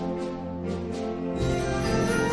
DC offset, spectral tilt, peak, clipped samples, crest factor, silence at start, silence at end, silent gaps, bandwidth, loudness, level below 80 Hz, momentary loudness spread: 0.2%; -6 dB/octave; -14 dBFS; under 0.1%; 14 dB; 0 s; 0 s; none; 11 kHz; -28 LUFS; -40 dBFS; 7 LU